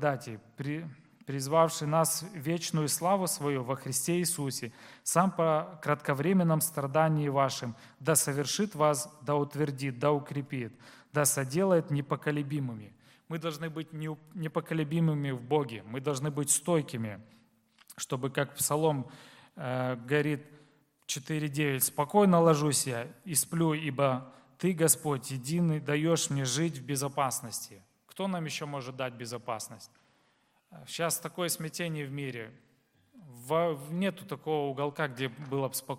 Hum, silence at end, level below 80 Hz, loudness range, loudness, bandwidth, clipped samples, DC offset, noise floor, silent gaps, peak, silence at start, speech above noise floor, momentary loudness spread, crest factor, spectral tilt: none; 0 s; -74 dBFS; 8 LU; -31 LUFS; 16.5 kHz; under 0.1%; under 0.1%; -70 dBFS; none; -8 dBFS; 0 s; 40 dB; 12 LU; 24 dB; -4.5 dB/octave